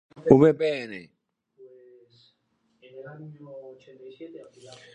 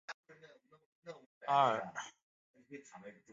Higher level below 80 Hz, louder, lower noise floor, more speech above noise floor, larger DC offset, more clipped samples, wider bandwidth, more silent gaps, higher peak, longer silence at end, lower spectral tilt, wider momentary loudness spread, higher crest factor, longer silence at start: first, -60 dBFS vs -88 dBFS; first, -20 LUFS vs -35 LUFS; first, -71 dBFS vs -63 dBFS; first, 46 dB vs 27 dB; neither; neither; first, 9.2 kHz vs 7.6 kHz; second, none vs 0.14-0.23 s, 0.86-1.02 s, 1.26-1.41 s, 2.23-2.54 s; first, -2 dBFS vs -16 dBFS; first, 0.7 s vs 0.2 s; first, -8 dB/octave vs -2.5 dB/octave; first, 27 LU vs 24 LU; about the same, 26 dB vs 24 dB; first, 0.25 s vs 0.1 s